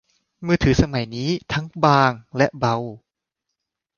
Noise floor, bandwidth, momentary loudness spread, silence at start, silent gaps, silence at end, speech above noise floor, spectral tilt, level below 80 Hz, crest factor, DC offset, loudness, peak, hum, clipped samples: -82 dBFS; 7.2 kHz; 10 LU; 0.4 s; none; 1 s; 62 dB; -6.5 dB/octave; -38 dBFS; 20 dB; under 0.1%; -20 LUFS; 0 dBFS; none; under 0.1%